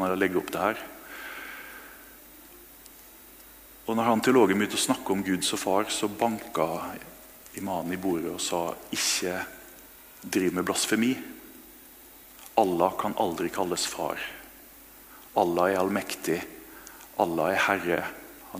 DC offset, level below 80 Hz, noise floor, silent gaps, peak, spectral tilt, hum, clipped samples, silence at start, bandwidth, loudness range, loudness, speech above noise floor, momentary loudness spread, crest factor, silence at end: under 0.1%; -62 dBFS; -50 dBFS; none; -6 dBFS; -3.5 dB/octave; none; under 0.1%; 0 s; 16 kHz; 5 LU; -27 LUFS; 23 dB; 23 LU; 24 dB; 0 s